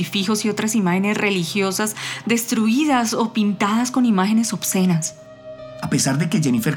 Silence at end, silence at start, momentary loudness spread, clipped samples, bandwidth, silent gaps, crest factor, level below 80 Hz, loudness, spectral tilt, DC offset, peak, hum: 0 s; 0 s; 6 LU; under 0.1%; 19.5 kHz; none; 14 dB; -62 dBFS; -19 LUFS; -4.5 dB/octave; under 0.1%; -6 dBFS; none